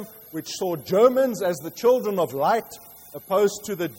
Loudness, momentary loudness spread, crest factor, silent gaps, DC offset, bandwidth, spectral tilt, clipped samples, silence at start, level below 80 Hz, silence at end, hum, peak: -23 LUFS; 19 LU; 18 dB; none; under 0.1%; 16.5 kHz; -5 dB/octave; under 0.1%; 0 s; -66 dBFS; 0 s; none; -6 dBFS